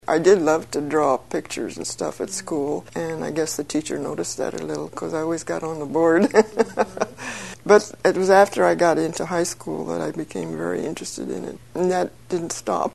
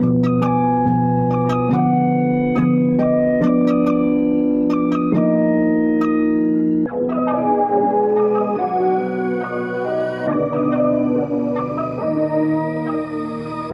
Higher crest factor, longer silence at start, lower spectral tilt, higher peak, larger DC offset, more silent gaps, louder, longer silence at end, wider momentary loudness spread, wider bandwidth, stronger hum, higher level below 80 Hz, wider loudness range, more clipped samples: first, 22 dB vs 10 dB; about the same, 0.1 s vs 0 s; second, -4.5 dB/octave vs -10 dB/octave; first, 0 dBFS vs -6 dBFS; first, 0.3% vs under 0.1%; neither; second, -22 LUFS vs -18 LUFS; about the same, 0 s vs 0 s; first, 13 LU vs 6 LU; first, 12.5 kHz vs 5.8 kHz; neither; second, -56 dBFS vs -48 dBFS; first, 7 LU vs 3 LU; neither